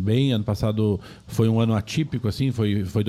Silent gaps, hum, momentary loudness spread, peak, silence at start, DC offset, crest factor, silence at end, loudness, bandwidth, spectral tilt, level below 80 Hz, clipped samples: none; none; 5 LU; -8 dBFS; 0 s; under 0.1%; 14 dB; 0 s; -23 LUFS; 14 kHz; -7.5 dB/octave; -46 dBFS; under 0.1%